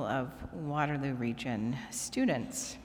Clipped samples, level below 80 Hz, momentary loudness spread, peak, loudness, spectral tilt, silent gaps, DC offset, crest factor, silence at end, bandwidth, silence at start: under 0.1%; -58 dBFS; 6 LU; -16 dBFS; -34 LUFS; -5 dB/octave; none; under 0.1%; 18 dB; 0 s; over 20 kHz; 0 s